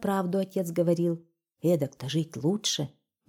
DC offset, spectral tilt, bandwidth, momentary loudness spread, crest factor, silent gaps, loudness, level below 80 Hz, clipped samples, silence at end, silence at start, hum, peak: under 0.1%; -5.5 dB/octave; 17.5 kHz; 5 LU; 16 dB; none; -29 LUFS; -70 dBFS; under 0.1%; 0.4 s; 0 s; none; -14 dBFS